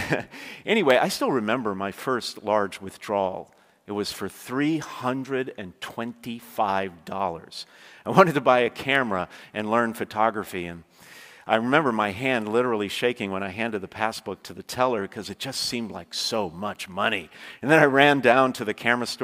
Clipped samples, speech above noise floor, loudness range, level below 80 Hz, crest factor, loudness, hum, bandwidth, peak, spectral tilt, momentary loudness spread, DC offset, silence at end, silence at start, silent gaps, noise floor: under 0.1%; 23 dB; 7 LU; -66 dBFS; 24 dB; -24 LUFS; none; 16 kHz; 0 dBFS; -4.5 dB/octave; 16 LU; under 0.1%; 0 s; 0 s; none; -48 dBFS